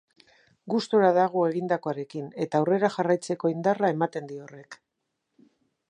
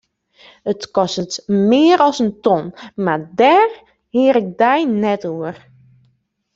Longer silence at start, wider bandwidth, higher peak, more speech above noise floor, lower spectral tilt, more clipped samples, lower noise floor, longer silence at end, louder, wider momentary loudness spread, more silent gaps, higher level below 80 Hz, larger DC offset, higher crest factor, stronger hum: about the same, 0.65 s vs 0.65 s; first, 11 kHz vs 7.8 kHz; second, -8 dBFS vs -2 dBFS; first, 55 dB vs 47 dB; about the same, -6.5 dB/octave vs -5.5 dB/octave; neither; first, -81 dBFS vs -62 dBFS; first, 1.15 s vs 1 s; second, -26 LUFS vs -16 LUFS; about the same, 15 LU vs 13 LU; neither; second, -80 dBFS vs -60 dBFS; neither; about the same, 20 dB vs 16 dB; neither